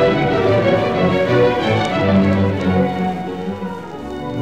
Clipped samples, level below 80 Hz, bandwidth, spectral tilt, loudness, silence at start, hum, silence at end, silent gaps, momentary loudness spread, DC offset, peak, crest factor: under 0.1%; -42 dBFS; 9.2 kHz; -7.5 dB/octave; -17 LUFS; 0 s; none; 0 s; none; 12 LU; 0.6%; -4 dBFS; 12 dB